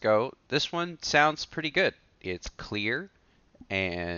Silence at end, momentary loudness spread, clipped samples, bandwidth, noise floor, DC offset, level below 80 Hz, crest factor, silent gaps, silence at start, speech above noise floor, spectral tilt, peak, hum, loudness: 0 s; 14 LU; under 0.1%; 7.2 kHz; -57 dBFS; under 0.1%; -56 dBFS; 22 dB; none; 0 s; 28 dB; -2 dB/octave; -8 dBFS; none; -28 LUFS